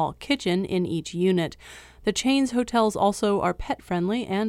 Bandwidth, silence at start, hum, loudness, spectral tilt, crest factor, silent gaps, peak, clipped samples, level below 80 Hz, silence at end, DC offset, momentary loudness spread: 15.5 kHz; 0 s; none; -25 LUFS; -5 dB/octave; 16 dB; none; -10 dBFS; under 0.1%; -48 dBFS; 0 s; under 0.1%; 8 LU